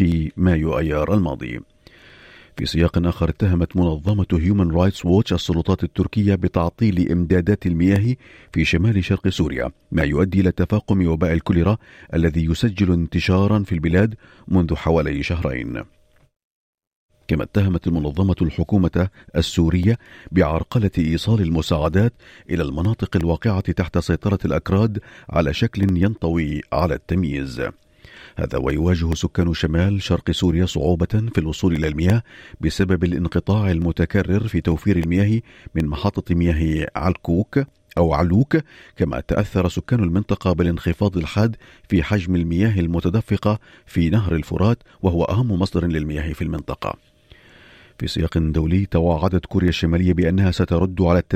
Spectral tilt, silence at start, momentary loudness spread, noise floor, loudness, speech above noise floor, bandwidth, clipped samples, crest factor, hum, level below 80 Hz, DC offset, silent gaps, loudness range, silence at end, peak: -7.5 dB/octave; 0 s; 7 LU; -49 dBFS; -20 LUFS; 30 dB; 14 kHz; under 0.1%; 16 dB; none; -36 dBFS; under 0.1%; 16.36-16.78 s, 16.87-17.09 s; 3 LU; 0 s; -4 dBFS